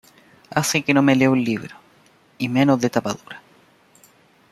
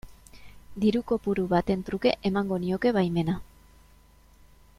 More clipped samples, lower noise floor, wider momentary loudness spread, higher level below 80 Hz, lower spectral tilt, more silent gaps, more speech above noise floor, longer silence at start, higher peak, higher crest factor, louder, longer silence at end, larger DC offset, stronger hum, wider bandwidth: neither; about the same, -55 dBFS vs -56 dBFS; first, 18 LU vs 5 LU; second, -62 dBFS vs -50 dBFS; second, -5 dB/octave vs -7.5 dB/octave; neither; first, 36 dB vs 30 dB; first, 0.5 s vs 0.05 s; first, -2 dBFS vs -8 dBFS; about the same, 20 dB vs 20 dB; first, -19 LUFS vs -27 LUFS; second, 1.15 s vs 1.35 s; neither; neither; about the same, 14 kHz vs 14 kHz